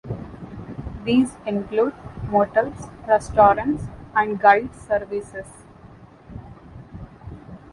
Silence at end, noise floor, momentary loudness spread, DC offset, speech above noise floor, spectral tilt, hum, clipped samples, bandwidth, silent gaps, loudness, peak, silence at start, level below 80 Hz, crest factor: 0.15 s; -46 dBFS; 25 LU; under 0.1%; 26 dB; -6.5 dB/octave; none; under 0.1%; 11.5 kHz; none; -21 LUFS; -2 dBFS; 0.05 s; -44 dBFS; 22 dB